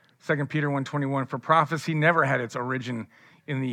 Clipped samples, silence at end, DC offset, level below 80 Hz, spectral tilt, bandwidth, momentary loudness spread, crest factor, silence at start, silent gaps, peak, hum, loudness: under 0.1%; 0 s; under 0.1%; -80 dBFS; -6.5 dB/octave; 12 kHz; 12 LU; 20 dB; 0.25 s; none; -6 dBFS; none; -26 LUFS